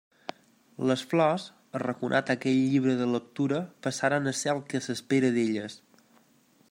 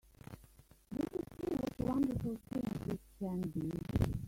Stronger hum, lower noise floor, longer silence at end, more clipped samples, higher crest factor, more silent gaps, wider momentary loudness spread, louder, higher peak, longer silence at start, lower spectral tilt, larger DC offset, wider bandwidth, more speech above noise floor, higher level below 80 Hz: neither; about the same, -63 dBFS vs -63 dBFS; first, 0.95 s vs 0 s; neither; about the same, 18 dB vs 22 dB; neither; second, 9 LU vs 14 LU; first, -28 LUFS vs -39 LUFS; first, -10 dBFS vs -18 dBFS; about the same, 0.3 s vs 0.3 s; second, -5.5 dB/octave vs -8 dB/octave; neither; about the same, 15.5 kHz vs 16.5 kHz; first, 36 dB vs 25 dB; second, -76 dBFS vs -52 dBFS